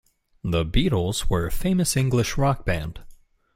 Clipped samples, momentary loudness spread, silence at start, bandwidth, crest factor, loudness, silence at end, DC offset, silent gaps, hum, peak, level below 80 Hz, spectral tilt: under 0.1%; 7 LU; 0.45 s; 16.5 kHz; 16 dB; -24 LUFS; 0.4 s; under 0.1%; none; none; -8 dBFS; -32 dBFS; -5.5 dB/octave